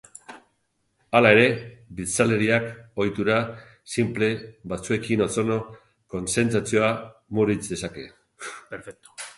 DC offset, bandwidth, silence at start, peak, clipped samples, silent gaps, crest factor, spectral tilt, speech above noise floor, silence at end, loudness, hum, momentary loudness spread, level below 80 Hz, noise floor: under 0.1%; 11.5 kHz; 0.3 s; -2 dBFS; under 0.1%; none; 24 dB; -5 dB/octave; 49 dB; 0.05 s; -23 LUFS; none; 20 LU; -54 dBFS; -72 dBFS